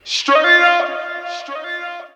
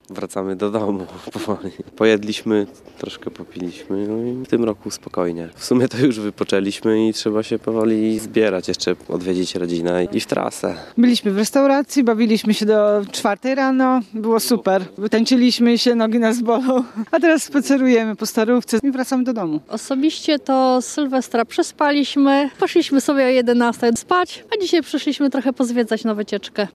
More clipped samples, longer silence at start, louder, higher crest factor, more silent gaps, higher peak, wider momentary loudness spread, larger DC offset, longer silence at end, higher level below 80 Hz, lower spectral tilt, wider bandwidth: neither; about the same, 0.05 s vs 0.1 s; first, -13 LUFS vs -18 LUFS; about the same, 18 dB vs 16 dB; neither; about the same, 0 dBFS vs -2 dBFS; first, 16 LU vs 10 LU; neither; about the same, 0.1 s vs 0.05 s; second, -72 dBFS vs -60 dBFS; second, 0.5 dB/octave vs -4.5 dB/octave; second, 10 kHz vs 14.5 kHz